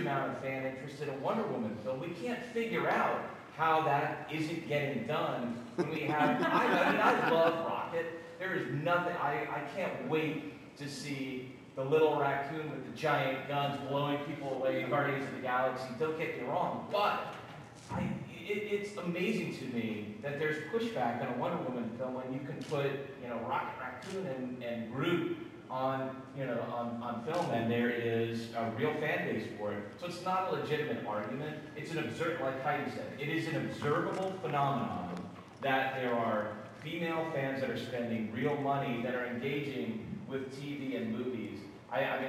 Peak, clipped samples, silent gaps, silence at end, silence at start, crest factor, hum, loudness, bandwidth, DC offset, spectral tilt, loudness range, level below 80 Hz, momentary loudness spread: -14 dBFS; under 0.1%; none; 0 s; 0 s; 22 dB; none; -35 LUFS; 16 kHz; under 0.1%; -6 dB/octave; 6 LU; -72 dBFS; 10 LU